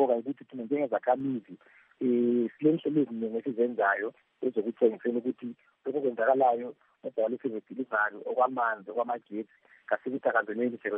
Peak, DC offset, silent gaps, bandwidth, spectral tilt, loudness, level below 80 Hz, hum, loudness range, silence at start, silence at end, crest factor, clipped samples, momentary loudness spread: -12 dBFS; under 0.1%; none; 3.7 kHz; -5.5 dB/octave; -30 LUFS; -86 dBFS; none; 3 LU; 0 s; 0 s; 18 dB; under 0.1%; 12 LU